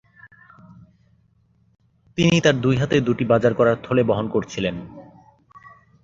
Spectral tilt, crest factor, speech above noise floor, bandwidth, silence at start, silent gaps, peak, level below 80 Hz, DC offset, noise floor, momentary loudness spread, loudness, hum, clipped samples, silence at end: -6 dB/octave; 20 dB; 41 dB; 7.8 kHz; 0.25 s; none; -2 dBFS; -52 dBFS; under 0.1%; -60 dBFS; 10 LU; -20 LUFS; none; under 0.1%; 1.05 s